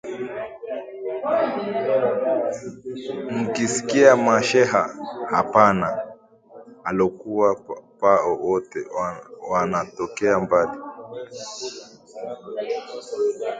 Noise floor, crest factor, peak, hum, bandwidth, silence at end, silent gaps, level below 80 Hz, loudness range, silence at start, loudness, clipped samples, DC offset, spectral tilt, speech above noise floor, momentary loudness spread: -47 dBFS; 22 dB; 0 dBFS; none; 9.6 kHz; 0 s; none; -60 dBFS; 6 LU; 0.05 s; -22 LUFS; under 0.1%; under 0.1%; -4.5 dB/octave; 25 dB; 17 LU